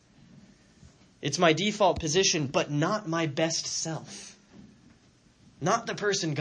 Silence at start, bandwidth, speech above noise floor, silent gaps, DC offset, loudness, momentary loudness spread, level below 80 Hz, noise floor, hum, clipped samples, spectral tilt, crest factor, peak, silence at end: 1.25 s; 10 kHz; 33 dB; none; under 0.1%; -27 LUFS; 12 LU; -58 dBFS; -60 dBFS; none; under 0.1%; -3.5 dB/octave; 22 dB; -8 dBFS; 0 s